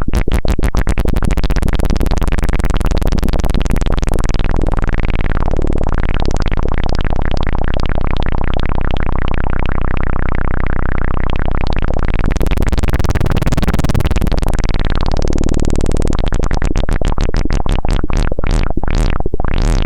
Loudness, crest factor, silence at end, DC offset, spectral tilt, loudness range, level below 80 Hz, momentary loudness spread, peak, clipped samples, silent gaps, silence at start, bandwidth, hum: -18 LUFS; 10 dB; 0 s; under 0.1%; -6.5 dB/octave; 2 LU; -14 dBFS; 3 LU; 0 dBFS; under 0.1%; none; 0 s; 10.5 kHz; none